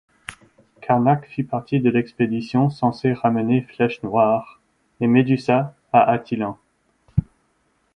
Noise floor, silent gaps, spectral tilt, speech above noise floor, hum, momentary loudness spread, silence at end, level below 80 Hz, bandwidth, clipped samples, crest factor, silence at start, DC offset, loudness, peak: -66 dBFS; none; -8.5 dB/octave; 47 dB; none; 9 LU; 0.7 s; -48 dBFS; 11.5 kHz; under 0.1%; 20 dB; 0.3 s; under 0.1%; -20 LUFS; 0 dBFS